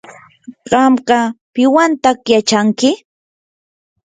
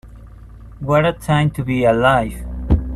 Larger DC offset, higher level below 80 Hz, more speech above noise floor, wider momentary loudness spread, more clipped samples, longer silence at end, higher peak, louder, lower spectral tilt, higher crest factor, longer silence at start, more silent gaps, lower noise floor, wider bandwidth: neither; second, -56 dBFS vs -28 dBFS; first, 26 dB vs 22 dB; second, 5 LU vs 12 LU; neither; first, 1.1 s vs 0 s; about the same, 0 dBFS vs -2 dBFS; first, -13 LUFS vs -17 LUFS; second, -4 dB/octave vs -7 dB/octave; about the same, 14 dB vs 16 dB; first, 0.5 s vs 0.05 s; first, 1.41-1.53 s vs none; about the same, -38 dBFS vs -38 dBFS; second, 9.4 kHz vs 13 kHz